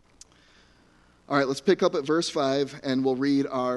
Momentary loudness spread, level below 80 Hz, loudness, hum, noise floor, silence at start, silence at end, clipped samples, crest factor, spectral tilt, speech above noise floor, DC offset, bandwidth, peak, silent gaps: 4 LU; -66 dBFS; -25 LUFS; none; -59 dBFS; 1.3 s; 0 s; under 0.1%; 18 dB; -5 dB/octave; 35 dB; under 0.1%; 11.5 kHz; -8 dBFS; none